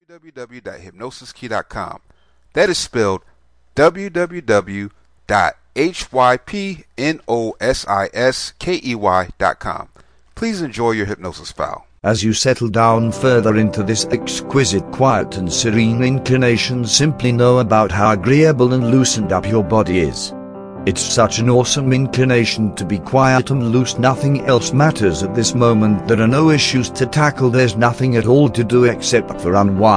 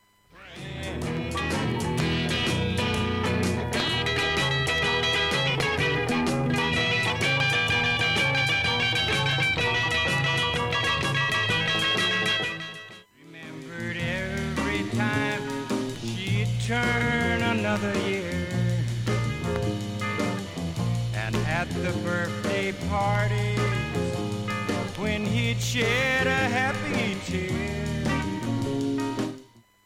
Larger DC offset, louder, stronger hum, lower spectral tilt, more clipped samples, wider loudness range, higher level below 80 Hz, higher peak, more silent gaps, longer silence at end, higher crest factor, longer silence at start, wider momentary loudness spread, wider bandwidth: neither; first, -16 LUFS vs -25 LUFS; neither; about the same, -5 dB/octave vs -4.5 dB/octave; neither; about the same, 6 LU vs 6 LU; about the same, -42 dBFS vs -44 dBFS; first, 0 dBFS vs -8 dBFS; neither; second, 0 s vs 0.45 s; about the same, 16 dB vs 18 dB; second, 0.15 s vs 0.35 s; first, 12 LU vs 8 LU; second, 10.5 kHz vs 16 kHz